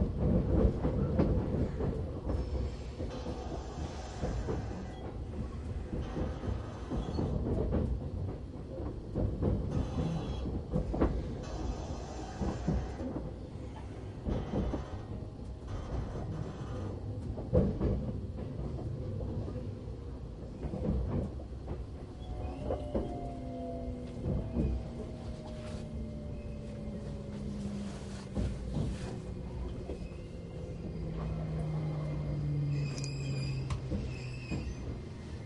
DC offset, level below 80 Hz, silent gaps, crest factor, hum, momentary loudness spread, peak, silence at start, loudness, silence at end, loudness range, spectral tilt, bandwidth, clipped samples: under 0.1%; -40 dBFS; none; 22 dB; none; 10 LU; -14 dBFS; 0 s; -37 LUFS; 0 s; 4 LU; -8 dB/octave; 11 kHz; under 0.1%